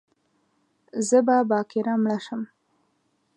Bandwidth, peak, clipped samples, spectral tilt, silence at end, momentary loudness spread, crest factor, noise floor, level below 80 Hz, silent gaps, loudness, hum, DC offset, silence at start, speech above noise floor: 11.5 kHz; -8 dBFS; under 0.1%; -5 dB/octave; 0.9 s; 16 LU; 18 dB; -70 dBFS; -80 dBFS; none; -23 LUFS; none; under 0.1%; 0.95 s; 48 dB